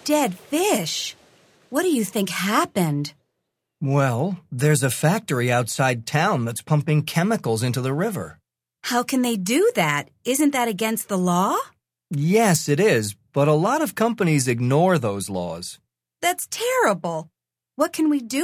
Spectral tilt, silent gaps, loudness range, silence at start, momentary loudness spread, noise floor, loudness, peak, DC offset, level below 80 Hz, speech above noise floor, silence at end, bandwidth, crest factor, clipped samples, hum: -5 dB/octave; none; 3 LU; 0.05 s; 9 LU; -78 dBFS; -22 LUFS; -4 dBFS; under 0.1%; -62 dBFS; 57 dB; 0 s; 16 kHz; 18 dB; under 0.1%; none